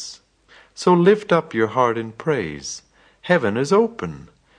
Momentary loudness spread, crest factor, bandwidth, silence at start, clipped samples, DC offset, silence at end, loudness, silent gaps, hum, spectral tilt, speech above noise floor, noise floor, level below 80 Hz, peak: 18 LU; 18 dB; 10 kHz; 0 s; under 0.1%; under 0.1%; 0.4 s; -19 LUFS; none; none; -5.5 dB/octave; 33 dB; -52 dBFS; -56 dBFS; -2 dBFS